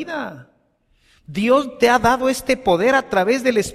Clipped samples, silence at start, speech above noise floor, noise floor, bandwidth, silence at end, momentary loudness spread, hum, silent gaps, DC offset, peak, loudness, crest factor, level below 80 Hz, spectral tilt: under 0.1%; 0 s; 44 dB; -61 dBFS; 15 kHz; 0 s; 12 LU; none; none; under 0.1%; -2 dBFS; -17 LUFS; 16 dB; -46 dBFS; -4.5 dB/octave